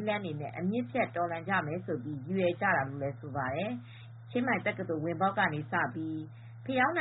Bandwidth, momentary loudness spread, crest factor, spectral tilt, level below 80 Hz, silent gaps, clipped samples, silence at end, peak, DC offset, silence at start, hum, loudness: 4.1 kHz; 10 LU; 18 dB; -5 dB/octave; -68 dBFS; none; under 0.1%; 0 s; -16 dBFS; under 0.1%; 0 s; none; -33 LUFS